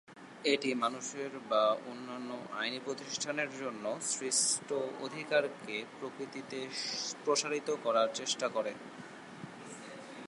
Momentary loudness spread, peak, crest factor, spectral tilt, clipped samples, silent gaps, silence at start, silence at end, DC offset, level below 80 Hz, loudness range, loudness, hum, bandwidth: 17 LU; -16 dBFS; 20 dB; -2 dB/octave; under 0.1%; none; 0.1 s; 0 s; under 0.1%; -86 dBFS; 2 LU; -34 LUFS; none; 11.5 kHz